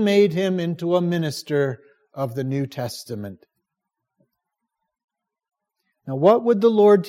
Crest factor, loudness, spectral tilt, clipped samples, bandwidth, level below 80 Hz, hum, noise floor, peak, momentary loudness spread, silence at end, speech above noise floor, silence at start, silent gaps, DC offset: 18 dB; -21 LUFS; -7 dB/octave; under 0.1%; 16 kHz; -72 dBFS; none; -82 dBFS; -4 dBFS; 17 LU; 0 s; 63 dB; 0 s; 5.04-5.08 s; under 0.1%